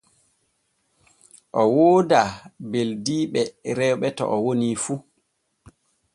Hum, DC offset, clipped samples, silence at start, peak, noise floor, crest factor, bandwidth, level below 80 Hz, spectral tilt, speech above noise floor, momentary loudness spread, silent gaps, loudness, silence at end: none; under 0.1%; under 0.1%; 1.55 s; -2 dBFS; -71 dBFS; 20 dB; 11.5 kHz; -62 dBFS; -5.5 dB/octave; 51 dB; 12 LU; none; -22 LUFS; 1.15 s